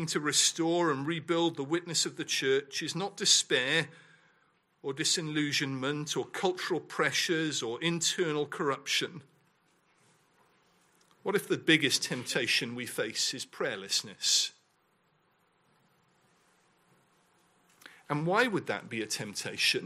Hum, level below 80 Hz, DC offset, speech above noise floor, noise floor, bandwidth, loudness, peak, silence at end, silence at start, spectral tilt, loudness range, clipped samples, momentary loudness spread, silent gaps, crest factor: none; -80 dBFS; under 0.1%; 40 dB; -71 dBFS; 15.5 kHz; -29 LUFS; -10 dBFS; 0 s; 0 s; -2.5 dB/octave; 7 LU; under 0.1%; 10 LU; none; 22 dB